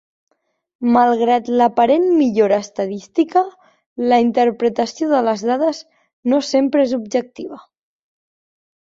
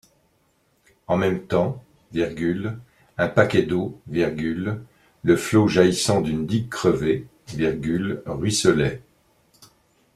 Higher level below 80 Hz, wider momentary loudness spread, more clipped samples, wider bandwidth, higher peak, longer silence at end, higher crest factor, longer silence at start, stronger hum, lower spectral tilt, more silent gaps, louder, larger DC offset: second, -64 dBFS vs -50 dBFS; about the same, 11 LU vs 12 LU; neither; second, 7.6 kHz vs 14 kHz; about the same, -2 dBFS vs -2 dBFS; about the same, 1.2 s vs 1.15 s; second, 16 dB vs 22 dB; second, 0.8 s vs 1.1 s; neither; about the same, -5 dB/octave vs -5.5 dB/octave; first, 3.86-3.96 s, 6.13-6.23 s vs none; first, -17 LUFS vs -22 LUFS; neither